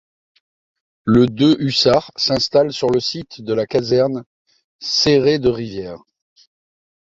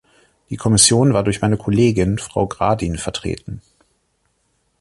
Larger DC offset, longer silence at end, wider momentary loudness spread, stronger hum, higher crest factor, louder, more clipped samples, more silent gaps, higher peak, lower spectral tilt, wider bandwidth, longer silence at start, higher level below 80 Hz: neither; about the same, 1.2 s vs 1.2 s; second, 14 LU vs 17 LU; neither; about the same, 16 dB vs 18 dB; about the same, -17 LUFS vs -17 LUFS; neither; first, 4.26-4.45 s, 4.64-4.79 s vs none; about the same, -2 dBFS vs 0 dBFS; about the same, -5.5 dB/octave vs -4.5 dB/octave; second, 7.8 kHz vs 11.5 kHz; first, 1.05 s vs 0.5 s; second, -48 dBFS vs -38 dBFS